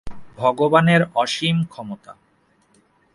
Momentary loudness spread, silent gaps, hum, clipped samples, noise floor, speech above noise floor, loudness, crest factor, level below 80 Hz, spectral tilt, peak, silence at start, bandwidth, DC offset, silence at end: 19 LU; none; none; under 0.1%; -61 dBFS; 42 dB; -18 LUFS; 20 dB; -50 dBFS; -6 dB/octave; 0 dBFS; 0.05 s; 11.5 kHz; under 0.1%; 1 s